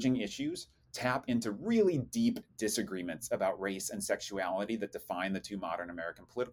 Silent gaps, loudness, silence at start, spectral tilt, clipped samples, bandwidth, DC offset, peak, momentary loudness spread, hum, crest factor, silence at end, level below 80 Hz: none; -35 LUFS; 0 s; -4.5 dB/octave; under 0.1%; 18 kHz; under 0.1%; -16 dBFS; 8 LU; none; 18 dB; 0 s; -66 dBFS